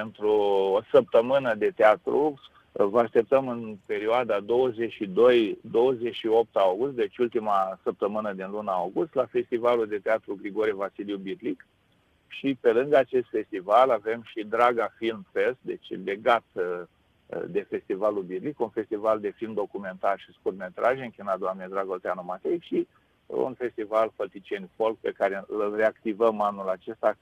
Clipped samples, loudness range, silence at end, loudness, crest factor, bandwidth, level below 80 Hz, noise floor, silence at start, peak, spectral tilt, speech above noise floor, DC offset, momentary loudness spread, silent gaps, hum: under 0.1%; 6 LU; 0.1 s; -26 LUFS; 20 dB; 10 kHz; -68 dBFS; -65 dBFS; 0 s; -6 dBFS; -7 dB/octave; 40 dB; under 0.1%; 12 LU; none; none